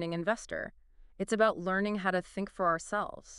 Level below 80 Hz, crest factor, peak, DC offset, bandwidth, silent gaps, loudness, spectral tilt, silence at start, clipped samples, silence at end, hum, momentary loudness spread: -60 dBFS; 20 dB; -12 dBFS; under 0.1%; 12 kHz; none; -32 LUFS; -5 dB/octave; 0 s; under 0.1%; 0 s; none; 11 LU